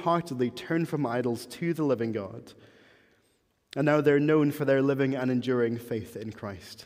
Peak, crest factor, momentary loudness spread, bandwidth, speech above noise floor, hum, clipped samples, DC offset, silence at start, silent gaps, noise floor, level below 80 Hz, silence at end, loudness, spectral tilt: -10 dBFS; 18 dB; 16 LU; 16 kHz; 43 dB; none; under 0.1%; under 0.1%; 0 s; none; -70 dBFS; -70 dBFS; 0 s; -27 LUFS; -7 dB/octave